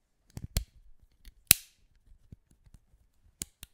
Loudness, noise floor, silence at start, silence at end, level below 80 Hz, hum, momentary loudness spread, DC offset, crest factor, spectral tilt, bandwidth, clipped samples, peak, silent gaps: -27 LUFS; -66 dBFS; 0.55 s; 2.15 s; -48 dBFS; none; 23 LU; under 0.1%; 36 dB; -1 dB/octave; 16.5 kHz; under 0.1%; 0 dBFS; none